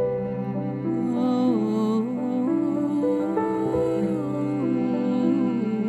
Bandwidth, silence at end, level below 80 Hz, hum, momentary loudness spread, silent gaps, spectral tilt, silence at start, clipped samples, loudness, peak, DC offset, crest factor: 8.4 kHz; 0 s; -56 dBFS; none; 5 LU; none; -9 dB/octave; 0 s; under 0.1%; -24 LUFS; -10 dBFS; under 0.1%; 12 dB